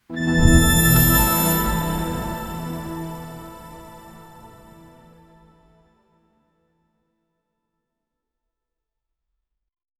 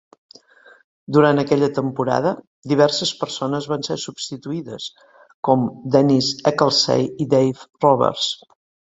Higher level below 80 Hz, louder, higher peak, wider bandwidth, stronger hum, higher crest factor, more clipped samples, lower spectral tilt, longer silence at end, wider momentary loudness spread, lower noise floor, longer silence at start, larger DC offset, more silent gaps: first, -30 dBFS vs -60 dBFS; about the same, -18 LUFS vs -19 LUFS; about the same, 0 dBFS vs -2 dBFS; first, 15 kHz vs 8 kHz; neither; about the same, 22 dB vs 18 dB; neither; about the same, -4.5 dB/octave vs -5 dB/octave; first, 5.55 s vs 0.55 s; first, 24 LU vs 13 LU; first, -82 dBFS vs -49 dBFS; second, 0.1 s vs 1.1 s; neither; second, none vs 2.47-2.63 s, 5.34-5.43 s